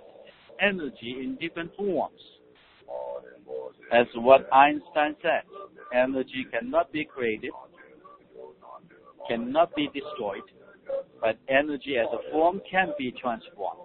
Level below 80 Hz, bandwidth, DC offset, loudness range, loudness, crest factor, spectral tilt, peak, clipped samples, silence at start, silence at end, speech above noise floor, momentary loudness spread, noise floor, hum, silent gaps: -64 dBFS; 4.4 kHz; under 0.1%; 8 LU; -26 LUFS; 24 dB; -2.5 dB/octave; -4 dBFS; under 0.1%; 0.2 s; 0 s; 31 dB; 18 LU; -57 dBFS; none; none